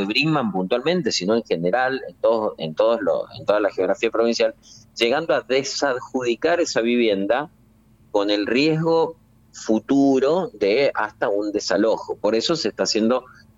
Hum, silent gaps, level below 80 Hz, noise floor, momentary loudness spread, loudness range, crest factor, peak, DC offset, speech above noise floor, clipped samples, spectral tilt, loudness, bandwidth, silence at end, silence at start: none; none; -60 dBFS; -54 dBFS; 5 LU; 1 LU; 14 dB; -6 dBFS; under 0.1%; 34 dB; under 0.1%; -4.5 dB/octave; -21 LUFS; 9.6 kHz; 0.35 s; 0 s